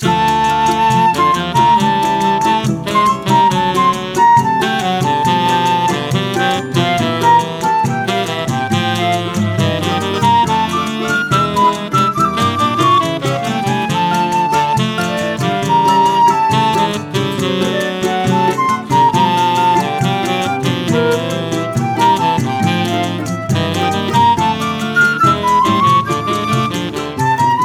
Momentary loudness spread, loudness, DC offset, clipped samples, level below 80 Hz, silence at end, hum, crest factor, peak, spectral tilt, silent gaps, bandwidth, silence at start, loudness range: 6 LU; -14 LUFS; under 0.1%; under 0.1%; -46 dBFS; 0 s; none; 12 dB; 0 dBFS; -5 dB/octave; none; 16.5 kHz; 0 s; 2 LU